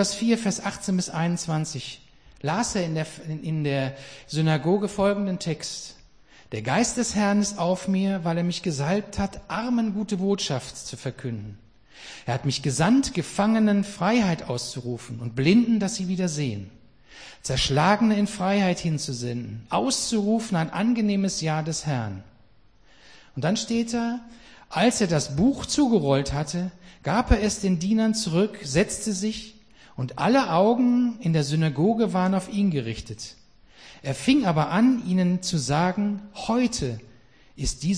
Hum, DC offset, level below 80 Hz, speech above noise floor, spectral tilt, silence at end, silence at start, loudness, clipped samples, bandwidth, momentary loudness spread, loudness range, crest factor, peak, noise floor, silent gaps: none; 0.1%; -44 dBFS; 34 dB; -5 dB/octave; 0 s; 0 s; -24 LUFS; under 0.1%; 10.5 kHz; 13 LU; 4 LU; 20 dB; -4 dBFS; -58 dBFS; none